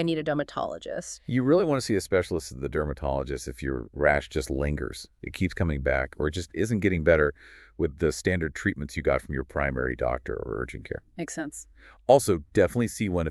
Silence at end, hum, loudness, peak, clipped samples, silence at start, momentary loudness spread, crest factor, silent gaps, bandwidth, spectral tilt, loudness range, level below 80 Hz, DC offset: 0 s; none; -27 LUFS; -6 dBFS; under 0.1%; 0 s; 13 LU; 22 dB; none; 13.5 kHz; -6 dB/octave; 3 LU; -40 dBFS; under 0.1%